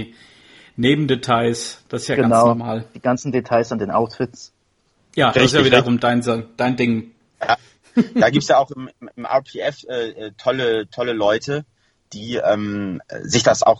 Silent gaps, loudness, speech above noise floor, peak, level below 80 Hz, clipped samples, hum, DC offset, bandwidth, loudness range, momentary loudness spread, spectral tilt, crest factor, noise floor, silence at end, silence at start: none; -19 LUFS; 45 dB; 0 dBFS; -52 dBFS; under 0.1%; none; under 0.1%; 11.5 kHz; 5 LU; 13 LU; -5 dB/octave; 20 dB; -63 dBFS; 0 s; 0 s